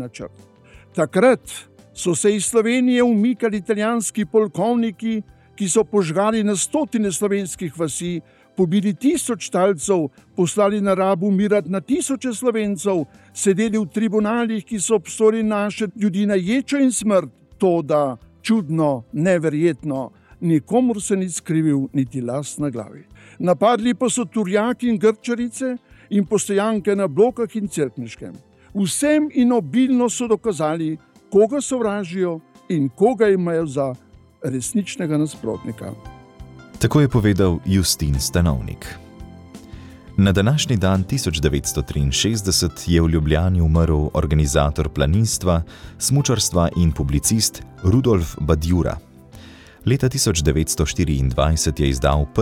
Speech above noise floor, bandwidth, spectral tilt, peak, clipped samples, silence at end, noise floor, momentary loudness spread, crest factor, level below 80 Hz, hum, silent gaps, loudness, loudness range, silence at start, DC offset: 23 dB; 17 kHz; -5.5 dB/octave; -2 dBFS; under 0.1%; 0 s; -42 dBFS; 10 LU; 18 dB; -34 dBFS; none; none; -19 LUFS; 3 LU; 0 s; under 0.1%